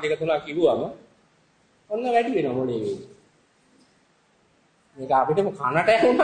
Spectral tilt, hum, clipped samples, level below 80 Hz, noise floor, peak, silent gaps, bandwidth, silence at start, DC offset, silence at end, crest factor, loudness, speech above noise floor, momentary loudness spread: -6 dB/octave; none; under 0.1%; -64 dBFS; -63 dBFS; -6 dBFS; none; 9.6 kHz; 0 s; under 0.1%; 0 s; 18 dB; -23 LUFS; 40 dB; 13 LU